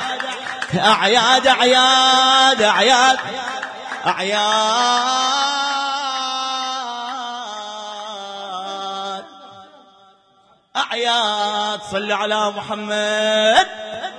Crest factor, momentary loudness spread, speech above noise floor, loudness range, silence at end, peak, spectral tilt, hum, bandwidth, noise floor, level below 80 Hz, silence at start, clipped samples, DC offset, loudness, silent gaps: 18 dB; 16 LU; 39 dB; 15 LU; 0 s; -2 dBFS; -1.5 dB/octave; none; 10.5 kHz; -55 dBFS; -62 dBFS; 0 s; under 0.1%; under 0.1%; -17 LUFS; none